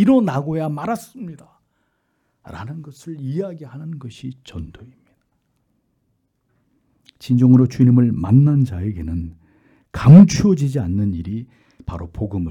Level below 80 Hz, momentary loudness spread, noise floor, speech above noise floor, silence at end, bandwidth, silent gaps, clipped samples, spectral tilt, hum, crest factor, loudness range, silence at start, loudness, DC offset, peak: -44 dBFS; 22 LU; -68 dBFS; 52 dB; 0 s; 12 kHz; none; under 0.1%; -8.5 dB/octave; none; 18 dB; 18 LU; 0 s; -16 LUFS; under 0.1%; 0 dBFS